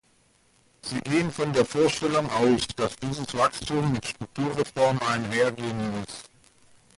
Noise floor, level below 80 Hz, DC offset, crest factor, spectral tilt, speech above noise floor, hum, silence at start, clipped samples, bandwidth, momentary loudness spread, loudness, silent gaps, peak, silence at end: -63 dBFS; -54 dBFS; under 0.1%; 18 dB; -5 dB/octave; 38 dB; none; 0.85 s; under 0.1%; 11.5 kHz; 10 LU; -26 LUFS; none; -8 dBFS; 0.75 s